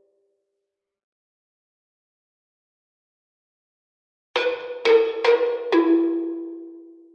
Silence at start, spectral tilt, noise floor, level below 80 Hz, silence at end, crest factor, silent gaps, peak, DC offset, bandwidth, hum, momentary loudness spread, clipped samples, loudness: 4.35 s; -3.5 dB/octave; -81 dBFS; -84 dBFS; 0.25 s; 20 dB; none; -6 dBFS; under 0.1%; 7 kHz; none; 14 LU; under 0.1%; -21 LUFS